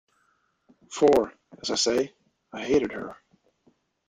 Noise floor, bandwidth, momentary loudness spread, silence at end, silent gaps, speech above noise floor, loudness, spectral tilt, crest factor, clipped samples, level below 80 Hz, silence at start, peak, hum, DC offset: -70 dBFS; 14 kHz; 18 LU; 0.95 s; none; 45 dB; -25 LUFS; -3.5 dB/octave; 20 dB; under 0.1%; -60 dBFS; 0.9 s; -8 dBFS; none; under 0.1%